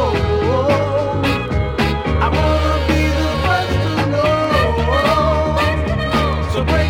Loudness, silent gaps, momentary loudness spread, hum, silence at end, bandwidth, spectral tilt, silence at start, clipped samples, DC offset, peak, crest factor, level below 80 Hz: -16 LUFS; none; 3 LU; none; 0 s; 16 kHz; -6.5 dB/octave; 0 s; under 0.1%; under 0.1%; -4 dBFS; 12 dB; -26 dBFS